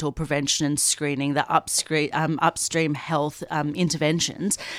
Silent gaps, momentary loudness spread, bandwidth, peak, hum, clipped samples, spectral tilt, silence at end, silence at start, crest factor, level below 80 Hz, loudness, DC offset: none; 5 LU; 16 kHz; -6 dBFS; none; under 0.1%; -3.5 dB/octave; 0 s; 0 s; 18 dB; -52 dBFS; -23 LUFS; under 0.1%